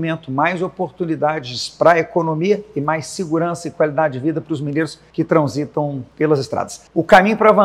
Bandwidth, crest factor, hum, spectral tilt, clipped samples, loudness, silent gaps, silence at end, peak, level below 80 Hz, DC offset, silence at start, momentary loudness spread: 13.5 kHz; 18 dB; none; -6 dB/octave; 0.2%; -18 LUFS; none; 0 s; 0 dBFS; -54 dBFS; under 0.1%; 0 s; 11 LU